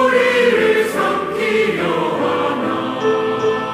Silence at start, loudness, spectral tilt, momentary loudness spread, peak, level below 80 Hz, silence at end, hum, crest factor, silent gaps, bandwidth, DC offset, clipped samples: 0 s; -16 LUFS; -5 dB/octave; 6 LU; -4 dBFS; -56 dBFS; 0 s; none; 14 dB; none; 16 kHz; under 0.1%; under 0.1%